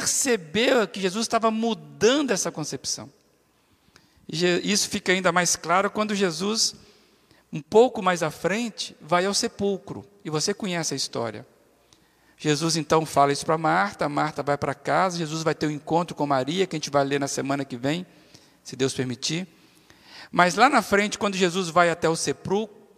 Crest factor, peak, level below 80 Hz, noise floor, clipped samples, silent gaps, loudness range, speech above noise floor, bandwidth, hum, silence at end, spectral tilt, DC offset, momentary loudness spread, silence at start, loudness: 22 dB; -4 dBFS; -64 dBFS; -63 dBFS; under 0.1%; none; 4 LU; 40 dB; 15.5 kHz; none; 0.3 s; -3.5 dB/octave; under 0.1%; 10 LU; 0 s; -24 LUFS